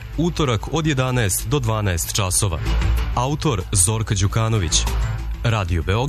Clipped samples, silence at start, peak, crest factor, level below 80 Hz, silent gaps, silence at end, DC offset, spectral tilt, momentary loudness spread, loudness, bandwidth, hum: under 0.1%; 0 s; -4 dBFS; 16 dB; -26 dBFS; none; 0 s; under 0.1%; -4 dB/octave; 5 LU; -20 LUFS; 13.5 kHz; none